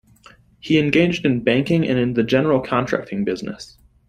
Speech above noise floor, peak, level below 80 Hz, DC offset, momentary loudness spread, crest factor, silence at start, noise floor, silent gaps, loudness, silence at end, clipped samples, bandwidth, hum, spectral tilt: 31 dB; -2 dBFS; -50 dBFS; under 0.1%; 14 LU; 18 dB; 0.65 s; -50 dBFS; none; -19 LUFS; 0.45 s; under 0.1%; 12.5 kHz; none; -7 dB/octave